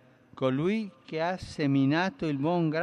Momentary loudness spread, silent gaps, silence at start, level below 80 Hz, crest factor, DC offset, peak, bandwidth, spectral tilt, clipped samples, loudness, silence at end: 7 LU; none; 0.35 s; -60 dBFS; 14 dB; under 0.1%; -14 dBFS; 10 kHz; -7.5 dB/octave; under 0.1%; -29 LUFS; 0 s